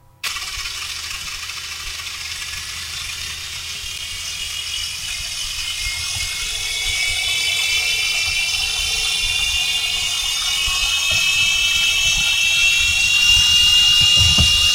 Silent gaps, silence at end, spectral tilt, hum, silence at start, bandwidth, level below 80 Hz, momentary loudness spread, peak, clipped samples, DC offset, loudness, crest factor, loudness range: none; 0 s; 0.5 dB/octave; none; 0.25 s; 16 kHz; -36 dBFS; 15 LU; -2 dBFS; under 0.1%; under 0.1%; -16 LUFS; 16 dB; 13 LU